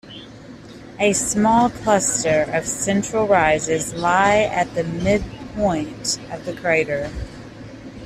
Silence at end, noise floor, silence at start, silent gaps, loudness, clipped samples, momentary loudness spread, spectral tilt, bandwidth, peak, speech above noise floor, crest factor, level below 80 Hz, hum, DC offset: 0 s; -39 dBFS; 0.05 s; none; -19 LUFS; under 0.1%; 21 LU; -4 dB/octave; 14 kHz; -4 dBFS; 20 dB; 16 dB; -42 dBFS; none; under 0.1%